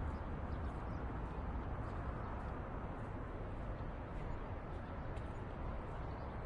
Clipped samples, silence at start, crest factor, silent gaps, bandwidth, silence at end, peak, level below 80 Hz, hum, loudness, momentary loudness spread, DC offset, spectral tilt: under 0.1%; 0 s; 14 dB; none; 9 kHz; 0 s; -30 dBFS; -48 dBFS; none; -46 LUFS; 3 LU; under 0.1%; -8.5 dB/octave